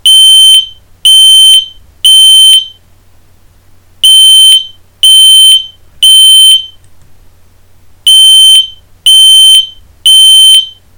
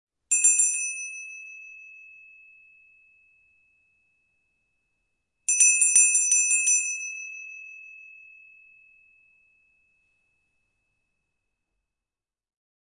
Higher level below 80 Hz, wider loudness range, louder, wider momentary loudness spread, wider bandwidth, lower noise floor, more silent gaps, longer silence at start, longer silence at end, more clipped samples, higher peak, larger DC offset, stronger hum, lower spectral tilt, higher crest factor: first, -46 dBFS vs -80 dBFS; second, 2 LU vs 20 LU; first, 0 LUFS vs -19 LUFS; second, 9 LU vs 26 LU; first, over 20 kHz vs 11.5 kHz; second, -39 dBFS vs under -90 dBFS; neither; second, 0.05 s vs 0.3 s; second, 0.3 s vs 4.85 s; first, 10% vs under 0.1%; first, 0 dBFS vs -4 dBFS; neither; neither; about the same, 4.5 dB/octave vs 5.5 dB/octave; second, 4 dB vs 24 dB